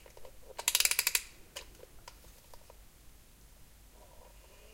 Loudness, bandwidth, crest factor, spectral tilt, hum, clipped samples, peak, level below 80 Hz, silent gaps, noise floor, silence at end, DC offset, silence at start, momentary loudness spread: -29 LUFS; 17 kHz; 34 dB; 1.5 dB/octave; none; under 0.1%; -6 dBFS; -58 dBFS; none; -57 dBFS; 0.05 s; under 0.1%; 0.15 s; 28 LU